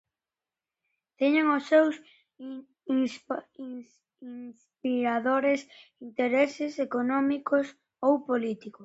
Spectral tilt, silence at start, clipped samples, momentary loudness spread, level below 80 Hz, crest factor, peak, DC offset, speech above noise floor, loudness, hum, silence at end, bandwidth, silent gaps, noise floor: -5 dB/octave; 1.2 s; under 0.1%; 19 LU; -78 dBFS; 18 dB; -10 dBFS; under 0.1%; over 62 dB; -27 LUFS; none; 0 s; 8 kHz; none; under -90 dBFS